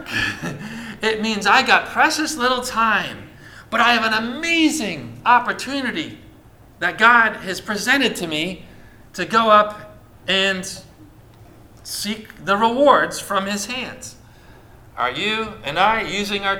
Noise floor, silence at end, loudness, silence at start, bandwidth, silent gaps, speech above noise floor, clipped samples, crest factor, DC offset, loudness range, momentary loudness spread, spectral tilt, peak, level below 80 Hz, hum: -46 dBFS; 0 s; -18 LUFS; 0 s; 19.5 kHz; none; 27 dB; under 0.1%; 20 dB; under 0.1%; 4 LU; 16 LU; -3 dB/octave; 0 dBFS; -50 dBFS; none